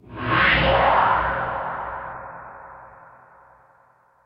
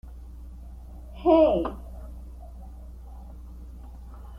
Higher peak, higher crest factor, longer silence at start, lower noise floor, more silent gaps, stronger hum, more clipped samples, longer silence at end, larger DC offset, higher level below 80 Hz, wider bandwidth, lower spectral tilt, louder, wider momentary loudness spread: about the same, -6 dBFS vs -8 dBFS; about the same, 18 dB vs 22 dB; about the same, 0.1 s vs 0.05 s; first, -58 dBFS vs -42 dBFS; neither; neither; neither; first, 1.3 s vs 0 s; neither; about the same, -40 dBFS vs -40 dBFS; about the same, 5.8 kHz vs 5.4 kHz; about the same, -8.5 dB/octave vs -8.5 dB/octave; about the same, -20 LUFS vs -22 LUFS; about the same, 23 LU vs 25 LU